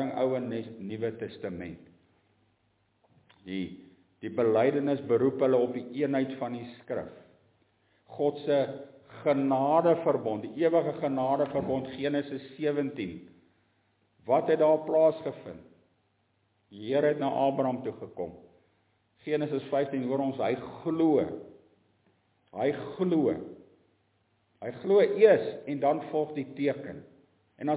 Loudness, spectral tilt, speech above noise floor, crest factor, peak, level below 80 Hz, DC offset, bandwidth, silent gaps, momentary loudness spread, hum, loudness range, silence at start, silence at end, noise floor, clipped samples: -29 LUFS; -10.5 dB/octave; 44 dB; 22 dB; -8 dBFS; -68 dBFS; under 0.1%; 4 kHz; none; 17 LU; none; 6 LU; 0 s; 0 s; -72 dBFS; under 0.1%